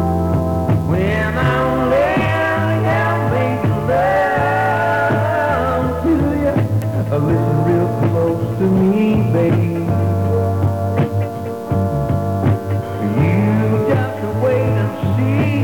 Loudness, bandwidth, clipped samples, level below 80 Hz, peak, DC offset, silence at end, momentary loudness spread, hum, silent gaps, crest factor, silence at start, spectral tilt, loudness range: -17 LUFS; 18.5 kHz; under 0.1%; -36 dBFS; -6 dBFS; 0.5%; 0 s; 4 LU; none; none; 10 dB; 0 s; -8.5 dB/octave; 2 LU